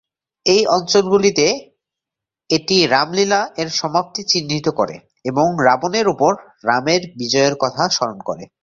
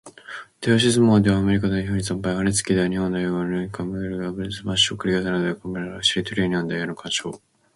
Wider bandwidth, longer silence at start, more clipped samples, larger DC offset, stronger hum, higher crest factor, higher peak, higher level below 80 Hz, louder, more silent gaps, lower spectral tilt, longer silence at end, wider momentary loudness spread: second, 7.8 kHz vs 11.5 kHz; first, 0.45 s vs 0.05 s; neither; neither; neither; about the same, 18 dB vs 18 dB; first, 0 dBFS vs -4 dBFS; second, -56 dBFS vs -46 dBFS; first, -17 LUFS vs -22 LUFS; neither; about the same, -3.5 dB/octave vs -4.5 dB/octave; second, 0.2 s vs 0.4 s; second, 8 LU vs 12 LU